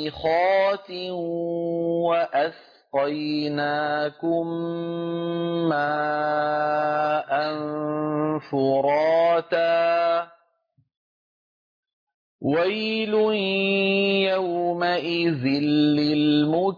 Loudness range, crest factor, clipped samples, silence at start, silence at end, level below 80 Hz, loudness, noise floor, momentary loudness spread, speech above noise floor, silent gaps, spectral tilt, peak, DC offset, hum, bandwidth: 5 LU; 12 dB; under 0.1%; 0 s; 0 s; -64 dBFS; -23 LUFS; -68 dBFS; 8 LU; 45 dB; 10.97-11.83 s, 11.93-12.07 s, 12.14-12.39 s; -7.5 dB/octave; -10 dBFS; under 0.1%; none; 5.2 kHz